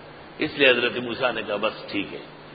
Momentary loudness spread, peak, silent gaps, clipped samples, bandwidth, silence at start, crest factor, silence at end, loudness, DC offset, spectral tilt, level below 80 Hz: 16 LU; -4 dBFS; none; under 0.1%; 5 kHz; 0 s; 22 dB; 0 s; -23 LUFS; under 0.1%; -8.5 dB/octave; -60 dBFS